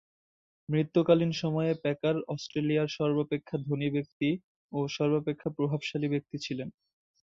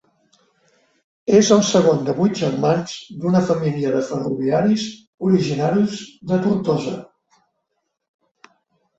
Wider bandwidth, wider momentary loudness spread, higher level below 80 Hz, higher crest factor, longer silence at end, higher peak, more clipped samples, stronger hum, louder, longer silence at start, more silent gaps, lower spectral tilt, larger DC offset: about the same, 7.6 kHz vs 8 kHz; about the same, 10 LU vs 12 LU; second, -70 dBFS vs -58 dBFS; about the same, 20 dB vs 18 dB; second, 0.6 s vs 1.95 s; second, -10 dBFS vs -2 dBFS; neither; neither; second, -30 LUFS vs -19 LUFS; second, 0.7 s vs 1.25 s; first, 4.13-4.20 s, 4.44-4.69 s vs 5.07-5.18 s; about the same, -7 dB/octave vs -6 dB/octave; neither